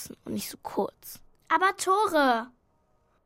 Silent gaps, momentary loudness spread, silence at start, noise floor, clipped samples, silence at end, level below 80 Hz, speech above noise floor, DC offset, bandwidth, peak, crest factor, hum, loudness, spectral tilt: none; 19 LU; 0 s; -68 dBFS; under 0.1%; 0.75 s; -64 dBFS; 41 dB; under 0.1%; 16.5 kHz; -10 dBFS; 18 dB; none; -27 LUFS; -3 dB/octave